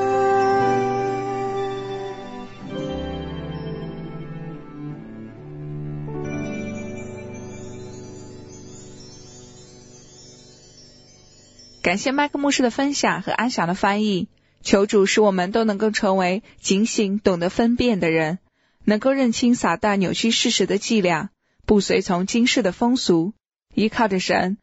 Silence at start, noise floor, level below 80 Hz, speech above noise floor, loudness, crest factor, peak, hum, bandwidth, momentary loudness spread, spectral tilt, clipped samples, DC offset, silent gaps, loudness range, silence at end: 0 s; -50 dBFS; -48 dBFS; 30 dB; -21 LUFS; 20 dB; -2 dBFS; none; 8.2 kHz; 18 LU; -4.5 dB/octave; under 0.1%; under 0.1%; none; 14 LU; 0.05 s